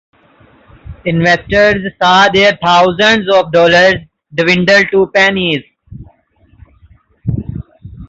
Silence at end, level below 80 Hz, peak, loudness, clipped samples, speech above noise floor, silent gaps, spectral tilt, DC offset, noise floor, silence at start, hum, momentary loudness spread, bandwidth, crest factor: 0.05 s; -38 dBFS; 0 dBFS; -10 LUFS; under 0.1%; 40 dB; none; -5 dB/octave; under 0.1%; -50 dBFS; 0.85 s; none; 14 LU; 8 kHz; 12 dB